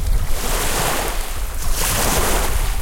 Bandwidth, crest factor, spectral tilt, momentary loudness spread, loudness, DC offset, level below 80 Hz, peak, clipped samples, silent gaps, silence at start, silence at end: 17 kHz; 14 dB; -2.5 dB/octave; 8 LU; -20 LUFS; under 0.1%; -20 dBFS; -4 dBFS; under 0.1%; none; 0 s; 0 s